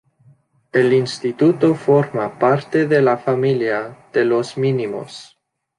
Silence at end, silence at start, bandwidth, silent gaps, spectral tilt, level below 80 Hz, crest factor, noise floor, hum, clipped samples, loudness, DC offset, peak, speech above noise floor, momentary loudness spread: 0.55 s; 0.75 s; 11 kHz; none; -7 dB/octave; -64 dBFS; 16 dB; -54 dBFS; none; under 0.1%; -18 LUFS; under 0.1%; -2 dBFS; 37 dB; 9 LU